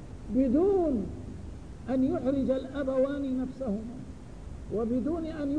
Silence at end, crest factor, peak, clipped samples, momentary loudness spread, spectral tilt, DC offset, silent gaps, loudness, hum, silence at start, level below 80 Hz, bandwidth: 0 s; 14 dB; -16 dBFS; under 0.1%; 18 LU; -8.5 dB/octave; 0.3%; none; -29 LUFS; none; 0 s; -46 dBFS; 10 kHz